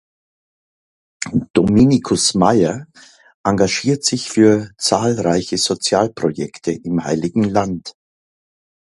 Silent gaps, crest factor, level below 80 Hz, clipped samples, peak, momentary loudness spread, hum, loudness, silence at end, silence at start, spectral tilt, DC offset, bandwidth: 1.50-1.54 s, 3.34-3.44 s; 18 dB; -44 dBFS; under 0.1%; 0 dBFS; 11 LU; none; -17 LUFS; 0.95 s; 1.2 s; -4.5 dB/octave; under 0.1%; 11.5 kHz